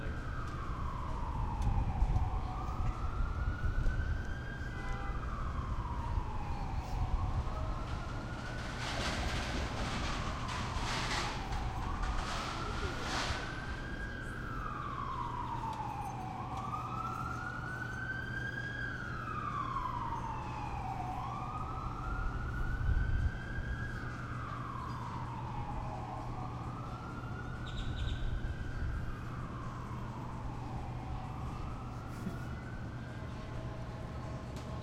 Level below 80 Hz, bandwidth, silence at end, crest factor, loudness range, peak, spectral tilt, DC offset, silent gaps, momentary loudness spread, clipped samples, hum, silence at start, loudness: -42 dBFS; 13 kHz; 0 s; 18 dB; 5 LU; -18 dBFS; -5.5 dB/octave; under 0.1%; none; 7 LU; under 0.1%; none; 0 s; -39 LUFS